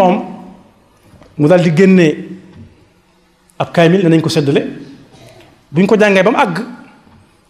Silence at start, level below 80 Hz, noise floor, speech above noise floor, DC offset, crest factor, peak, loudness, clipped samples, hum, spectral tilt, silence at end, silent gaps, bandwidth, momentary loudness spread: 0 s; -54 dBFS; -52 dBFS; 42 dB; under 0.1%; 14 dB; 0 dBFS; -11 LUFS; under 0.1%; none; -7 dB/octave; 0.75 s; none; 12 kHz; 21 LU